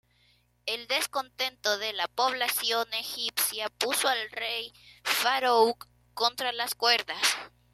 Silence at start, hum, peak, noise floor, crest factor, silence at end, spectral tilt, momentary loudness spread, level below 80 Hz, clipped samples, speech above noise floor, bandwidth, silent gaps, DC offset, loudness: 0.65 s; 60 Hz at -65 dBFS; -8 dBFS; -66 dBFS; 22 dB; 0.25 s; 0.5 dB/octave; 10 LU; -70 dBFS; under 0.1%; 37 dB; 15.5 kHz; none; under 0.1%; -27 LUFS